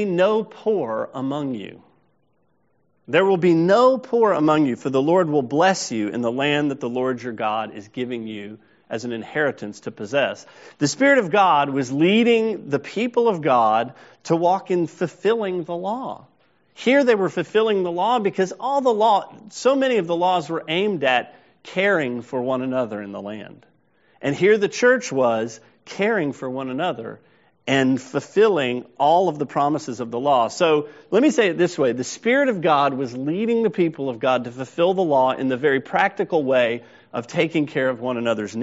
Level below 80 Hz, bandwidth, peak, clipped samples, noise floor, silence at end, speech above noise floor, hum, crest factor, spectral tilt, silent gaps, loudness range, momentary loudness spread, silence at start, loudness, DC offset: -68 dBFS; 8 kHz; -2 dBFS; under 0.1%; -67 dBFS; 0 s; 46 dB; none; 18 dB; -4 dB/octave; none; 5 LU; 12 LU; 0 s; -20 LUFS; under 0.1%